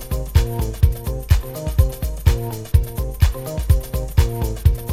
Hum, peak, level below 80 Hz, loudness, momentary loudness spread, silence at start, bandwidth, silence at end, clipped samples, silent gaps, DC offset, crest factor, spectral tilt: none; 0 dBFS; -20 dBFS; -21 LUFS; 4 LU; 0 s; 16 kHz; 0 s; under 0.1%; none; under 0.1%; 18 dB; -6 dB/octave